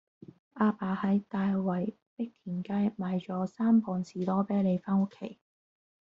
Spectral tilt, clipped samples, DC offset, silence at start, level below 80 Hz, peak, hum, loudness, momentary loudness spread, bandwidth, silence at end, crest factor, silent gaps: -8.5 dB/octave; under 0.1%; under 0.1%; 0.55 s; -70 dBFS; -14 dBFS; none; -31 LUFS; 12 LU; 7.2 kHz; 0.8 s; 16 dB; 2.02-2.17 s